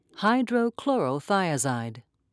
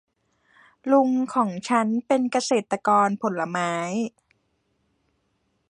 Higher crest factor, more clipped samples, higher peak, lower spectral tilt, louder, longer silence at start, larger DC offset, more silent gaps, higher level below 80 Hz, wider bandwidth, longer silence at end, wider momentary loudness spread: about the same, 16 dB vs 18 dB; neither; second, -10 dBFS vs -6 dBFS; about the same, -5 dB/octave vs -5 dB/octave; second, -26 LUFS vs -23 LUFS; second, 0.15 s vs 0.85 s; neither; neither; about the same, -76 dBFS vs -74 dBFS; about the same, 11 kHz vs 10.5 kHz; second, 0.3 s vs 1.65 s; about the same, 6 LU vs 7 LU